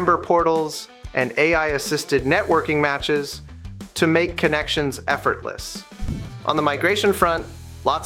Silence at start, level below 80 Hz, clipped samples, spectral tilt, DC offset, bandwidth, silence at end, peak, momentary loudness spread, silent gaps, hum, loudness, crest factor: 0 s; -40 dBFS; under 0.1%; -4.5 dB/octave; under 0.1%; 16.5 kHz; 0 s; -2 dBFS; 14 LU; none; none; -21 LUFS; 18 dB